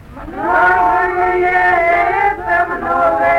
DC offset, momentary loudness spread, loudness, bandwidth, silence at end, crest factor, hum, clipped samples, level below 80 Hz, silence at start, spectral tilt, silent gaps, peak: under 0.1%; 5 LU; -13 LUFS; 9.8 kHz; 0 s; 12 dB; none; under 0.1%; -38 dBFS; 0 s; -6 dB/octave; none; -2 dBFS